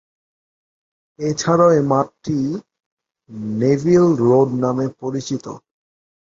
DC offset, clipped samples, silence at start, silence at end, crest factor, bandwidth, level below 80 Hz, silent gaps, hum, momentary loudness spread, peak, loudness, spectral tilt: under 0.1%; under 0.1%; 1.2 s; 0.75 s; 18 dB; 7.8 kHz; -56 dBFS; 2.86-2.97 s; none; 16 LU; -2 dBFS; -18 LUFS; -7 dB/octave